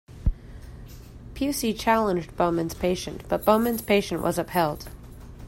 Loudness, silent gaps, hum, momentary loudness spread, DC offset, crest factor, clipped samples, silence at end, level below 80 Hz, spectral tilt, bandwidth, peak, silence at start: -25 LUFS; none; none; 22 LU; under 0.1%; 20 dB; under 0.1%; 0 s; -38 dBFS; -5 dB/octave; 16 kHz; -6 dBFS; 0.1 s